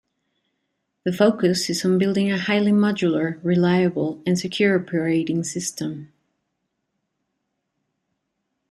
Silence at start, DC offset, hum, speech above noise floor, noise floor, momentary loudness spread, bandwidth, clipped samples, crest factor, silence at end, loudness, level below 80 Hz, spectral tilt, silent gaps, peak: 1.05 s; under 0.1%; none; 56 dB; -77 dBFS; 9 LU; 14 kHz; under 0.1%; 18 dB; 2.65 s; -21 LUFS; -64 dBFS; -5.5 dB/octave; none; -4 dBFS